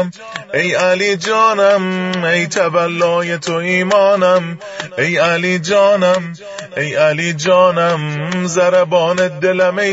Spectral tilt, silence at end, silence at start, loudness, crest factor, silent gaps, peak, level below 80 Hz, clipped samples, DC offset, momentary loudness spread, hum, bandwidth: -4.5 dB/octave; 0 s; 0 s; -14 LUFS; 14 dB; none; 0 dBFS; -62 dBFS; under 0.1%; under 0.1%; 9 LU; none; 8 kHz